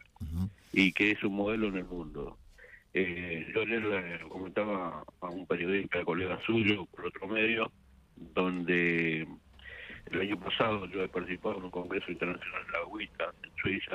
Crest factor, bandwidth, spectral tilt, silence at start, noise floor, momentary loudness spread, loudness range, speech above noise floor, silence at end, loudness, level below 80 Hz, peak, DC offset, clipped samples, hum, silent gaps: 20 dB; 15 kHz; -6.5 dB/octave; 0.2 s; -56 dBFS; 13 LU; 4 LU; 23 dB; 0 s; -33 LUFS; -58 dBFS; -12 dBFS; under 0.1%; under 0.1%; none; none